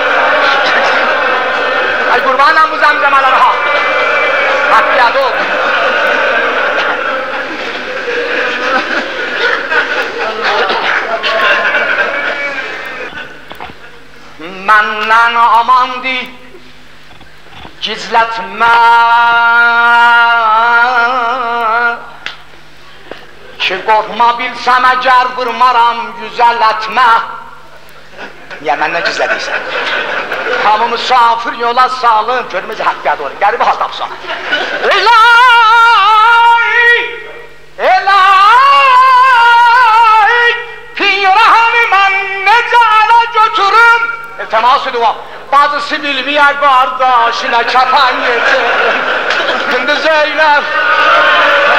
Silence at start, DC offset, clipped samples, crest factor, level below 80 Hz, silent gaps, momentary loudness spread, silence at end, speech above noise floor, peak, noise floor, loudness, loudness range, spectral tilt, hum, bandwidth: 0 s; 2%; under 0.1%; 10 dB; -50 dBFS; none; 12 LU; 0 s; 29 dB; 0 dBFS; -38 dBFS; -9 LUFS; 7 LU; -2 dB/octave; none; 15.5 kHz